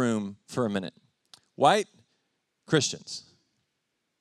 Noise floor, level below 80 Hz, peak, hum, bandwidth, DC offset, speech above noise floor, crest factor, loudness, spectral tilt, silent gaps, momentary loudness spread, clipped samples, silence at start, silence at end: -80 dBFS; -78 dBFS; -8 dBFS; none; 13.5 kHz; under 0.1%; 53 dB; 22 dB; -27 LUFS; -4 dB/octave; none; 17 LU; under 0.1%; 0 s; 1 s